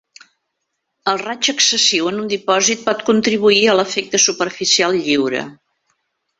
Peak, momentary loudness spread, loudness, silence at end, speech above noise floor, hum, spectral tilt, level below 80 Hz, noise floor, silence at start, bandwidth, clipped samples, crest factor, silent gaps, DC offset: 0 dBFS; 9 LU; -15 LUFS; 0.85 s; 58 dB; none; -1.5 dB/octave; -60 dBFS; -74 dBFS; 1.05 s; 8.4 kHz; under 0.1%; 18 dB; none; under 0.1%